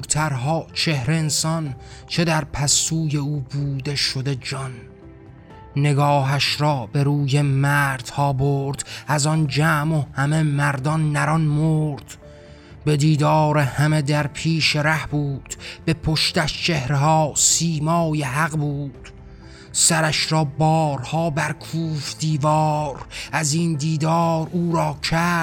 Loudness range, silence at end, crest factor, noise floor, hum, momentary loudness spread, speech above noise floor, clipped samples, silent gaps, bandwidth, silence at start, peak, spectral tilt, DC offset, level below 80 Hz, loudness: 2 LU; 0 s; 18 dB; -42 dBFS; none; 9 LU; 22 dB; under 0.1%; none; 16.5 kHz; 0 s; -4 dBFS; -4.5 dB/octave; under 0.1%; -46 dBFS; -20 LUFS